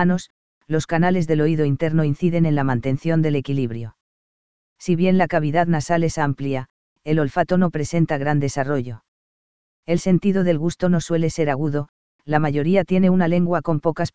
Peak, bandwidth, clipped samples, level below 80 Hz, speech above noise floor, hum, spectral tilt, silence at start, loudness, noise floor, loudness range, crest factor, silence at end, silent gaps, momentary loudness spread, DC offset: -2 dBFS; 8 kHz; under 0.1%; -48 dBFS; over 71 dB; none; -7.5 dB/octave; 0 s; -20 LUFS; under -90 dBFS; 2 LU; 18 dB; 0 s; 0.30-0.61 s, 4.01-4.76 s, 6.70-6.96 s, 9.08-9.83 s, 11.89-12.19 s; 8 LU; 2%